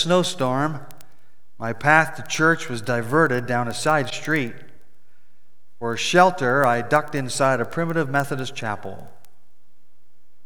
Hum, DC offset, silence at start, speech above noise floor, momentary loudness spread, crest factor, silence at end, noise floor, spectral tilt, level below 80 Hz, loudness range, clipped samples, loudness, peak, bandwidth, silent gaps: none; 2%; 0 s; 46 dB; 14 LU; 22 dB; 1.4 s; -68 dBFS; -4.5 dB/octave; -64 dBFS; 3 LU; under 0.1%; -21 LUFS; 0 dBFS; over 20 kHz; none